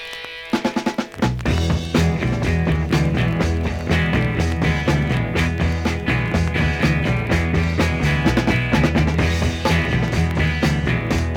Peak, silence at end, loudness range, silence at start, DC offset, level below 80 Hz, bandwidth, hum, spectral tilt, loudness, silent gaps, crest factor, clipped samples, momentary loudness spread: -4 dBFS; 0 s; 2 LU; 0 s; under 0.1%; -30 dBFS; 16 kHz; none; -6 dB/octave; -19 LUFS; none; 16 dB; under 0.1%; 4 LU